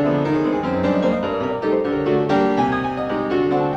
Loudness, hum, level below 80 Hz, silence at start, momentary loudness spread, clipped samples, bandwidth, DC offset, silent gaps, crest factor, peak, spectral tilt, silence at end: -20 LUFS; none; -48 dBFS; 0 s; 4 LU; under 0.1%; 7.8 kHz; under 0.1%; none; 12 dB; -6 dBFS; -8 dB/octave; 0 s